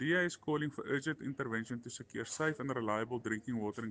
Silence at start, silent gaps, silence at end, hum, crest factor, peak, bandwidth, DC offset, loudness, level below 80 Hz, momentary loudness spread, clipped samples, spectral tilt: 0 s; none; 0 s; none; 18 dB; -20 dBFS; 10 kHz; under 0.1%; -38 LUFS; -74 dBFS; 8 LU; under 0.1%; -5 dB/octave